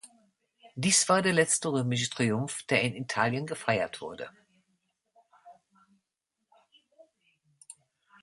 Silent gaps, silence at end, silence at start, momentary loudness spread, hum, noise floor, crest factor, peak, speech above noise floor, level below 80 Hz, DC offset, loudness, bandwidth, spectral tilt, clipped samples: none; 0.5 s; 0.05 s; 16 LU; none; -85 dBFS; 22 dB; -10 dBFS; 56 dB; -70 dBFS; under 0.1%; -27 LUFS; 11.5 kHz; -3.5 dB/octave; under 0.1%